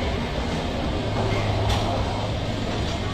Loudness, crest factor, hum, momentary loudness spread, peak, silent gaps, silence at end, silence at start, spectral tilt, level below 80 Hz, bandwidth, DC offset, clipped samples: -25 LUFS; 14 dB; none; 4 LU; -10 dBFS; none; 0 s; 0 s; -6 dB/octave; -32 dBFS; 13 kHz; under 0.1%; under 0.1%